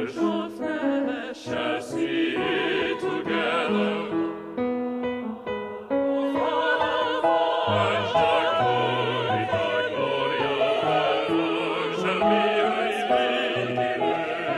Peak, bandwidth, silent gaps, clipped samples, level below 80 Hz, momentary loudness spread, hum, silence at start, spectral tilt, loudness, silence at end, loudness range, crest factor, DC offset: -10 dBFS; 12.5 kHz; none; under 0.1%; -60 dBFS; 7 LU; none; 0 s; -5.5 dB/octave; -24 LUFS; 0 s; 4 LU; 14 dB; under 0.1%